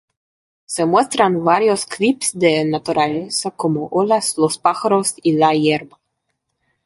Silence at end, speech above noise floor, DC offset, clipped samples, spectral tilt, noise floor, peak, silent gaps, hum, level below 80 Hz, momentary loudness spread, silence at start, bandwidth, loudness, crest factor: 1 s; 56 dB; under 0.1%; under 0.1%; -4 dB/octave; -73 dBFS; -2 dBFS; none; none; -62 dBFS; 6 LU; 0.7 s; 12 kHz; -17 LUFS; 16 dB